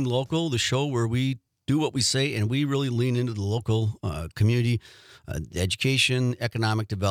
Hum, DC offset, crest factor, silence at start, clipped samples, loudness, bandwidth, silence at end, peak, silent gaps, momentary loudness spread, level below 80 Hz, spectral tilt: none; under 0.1%; 16 dB; 0 s; under 0.1%; -25 LUFS; 15.5 kHz; 0 s; -8 dBFS; none; 8 LU; -52 dBFS; -5 dB/octave